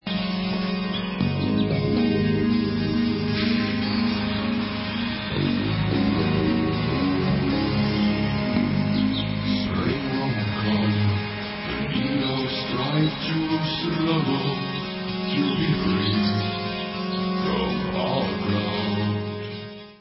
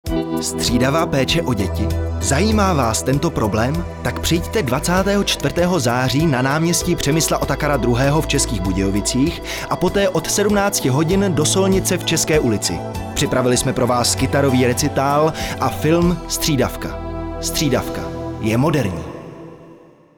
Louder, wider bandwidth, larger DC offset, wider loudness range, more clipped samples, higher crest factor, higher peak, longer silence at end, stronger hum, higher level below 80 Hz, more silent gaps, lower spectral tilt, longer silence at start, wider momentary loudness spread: second, -24 LUFS vs -18 LUFS; second, 5.8 kHz vs over 20 kHz; neither; about the same, 2 LU vs 3 LU; neither; about the same, 14 dB vs 14 dB; second, -10 dBFS vs -4 dBFS; second, 0.05 s vs 0.4 s; neither; second, -42 dBFS vs -32 dBFS; neither; first, -10.5 dB/octave vs -4.5 dB/octave; about the same, 0.05 s vs 0.05 s; about the same, 5 LU vs 7 LU